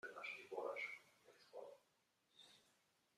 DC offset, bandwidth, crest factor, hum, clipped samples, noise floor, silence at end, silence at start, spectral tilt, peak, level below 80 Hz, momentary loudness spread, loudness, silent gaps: under 0.1%; 14.5 kHz; 22 dB; none; under 0.1%; -83 dBFS; 0.5 s; 0.05 s; -2.5 dB/octave; -34 dBFS; under -90 dBFS; 19 LU; -51 LUFS; none